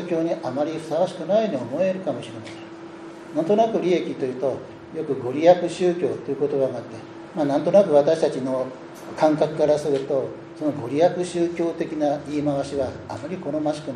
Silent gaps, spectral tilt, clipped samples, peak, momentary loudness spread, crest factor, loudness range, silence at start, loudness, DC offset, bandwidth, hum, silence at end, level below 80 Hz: none; -6.5 dB/octave; under 0.1%; -2 dBFS; 16 LU; 20 dB; 4 LU; 0 s; -23 LUFS; under 0.1%; 11.5 kHz; none; 0 s; -62 dBFS